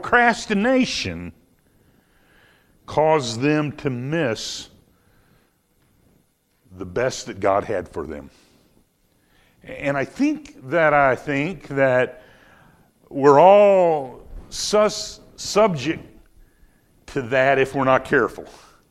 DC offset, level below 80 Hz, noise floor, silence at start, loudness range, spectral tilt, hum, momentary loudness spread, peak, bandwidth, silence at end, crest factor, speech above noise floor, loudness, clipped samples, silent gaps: under 0.1%; -50 dBFS; -63 dBFS; 0 s; 10 LU; -5 dB/octave; none; 17 LU; 0 dBFS; 13.5 kHz; 0.4 s; 20 dB; 44 dB; -20 LUFS; under 0.1%; none